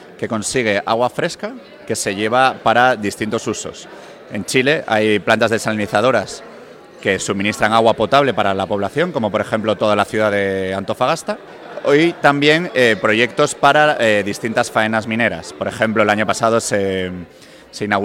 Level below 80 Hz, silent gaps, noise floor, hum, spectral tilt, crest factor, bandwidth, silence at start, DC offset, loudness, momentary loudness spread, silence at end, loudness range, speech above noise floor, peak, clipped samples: -54 dBFS; none; -39 dBFS; none; -4 dB/octave; 16 dB; 16.5 kHz; 0 s; under 0.1%; -16 LUFS; 12 LU; 0 s; 4 LU; 22 dB; 0 dBFS; under 0.1%